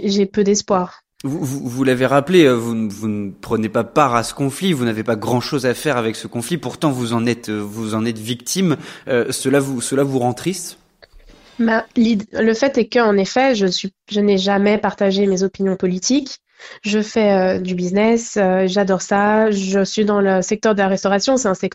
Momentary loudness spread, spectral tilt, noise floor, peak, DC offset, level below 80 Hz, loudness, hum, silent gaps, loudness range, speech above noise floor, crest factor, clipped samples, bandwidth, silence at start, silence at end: 8 LU; -5 dB/octave; -46 dBFS; 0 dBFS; under 0.1%; -52 dBFS; -18 LUFS; none; none; 4 LU; 29 dB; 18 dB; under 0.1%; 16 kHz; 0 s; 0.05 s